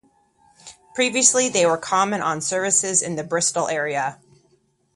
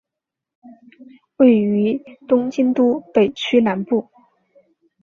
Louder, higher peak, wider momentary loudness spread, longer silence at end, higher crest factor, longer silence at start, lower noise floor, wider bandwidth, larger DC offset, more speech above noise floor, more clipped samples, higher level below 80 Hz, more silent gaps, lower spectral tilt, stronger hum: about the same, -20 LUFS vs -18 LUFS; about the same, 0 dBFS vs -2 dBFS; about the same, 9 LU vs 8 LU; second, 0.8 s vs 1 s; about the same, 22 dB vs 18 dB; about the same, 0.65 s vs 0.65 s; second, -63 dBFS vs -84 dBFS; first, 11.5 kHz vs 7 kHz; neither; second, 42 dB vs 67 dB; neither; about the same, -66 dBFS vs -62 dBFS; neither; second, -2 dB/octave vs -7 dB/octave; neither